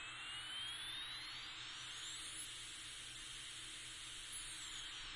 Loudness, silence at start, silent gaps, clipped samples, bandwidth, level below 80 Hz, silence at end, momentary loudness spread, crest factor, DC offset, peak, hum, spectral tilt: -47 LUFS; 0 s; none; under 0.1%; 11.5 kHz; -68 dBFS; 0 s; 4 LU; 14 dB; under 0.1%; -36 dBFS; none; 0.5 dB/octave